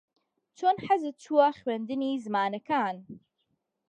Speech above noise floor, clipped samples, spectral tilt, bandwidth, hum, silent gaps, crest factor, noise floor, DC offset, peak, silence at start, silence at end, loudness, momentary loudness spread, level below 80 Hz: 50 dB; under 0.1%; -6 dB/octave; 9.2 kHz; none; none; 20 dB; -78 dBFS; under 0.1%; -10 dBFS; 0.6 s; 0.75 s; -28 LUFS; 8 LU; -76 dBFS